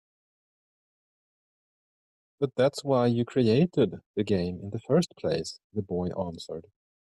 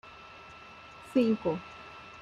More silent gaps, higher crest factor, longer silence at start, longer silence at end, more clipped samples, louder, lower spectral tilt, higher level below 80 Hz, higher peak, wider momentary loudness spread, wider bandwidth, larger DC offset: first, 4.06-4.14 s, 5.64-5.70 s vs none; about the same, 18 dB vs 20 dB; first, 2.4 s vs 0.05 s; first, 0.55 s vs 0 s; neither; about the same, -28 LUFS vs -30 LUFS; about the same, -7 dB/octave vs -7 dB/octave; about the same, -64 dBFS vs -66 dBFS; about the same, -12 dBFS vs -14 dBFS; second, 12 LU vs 21 LU; about the same, 12 kHz vs 11.5 kHz; neither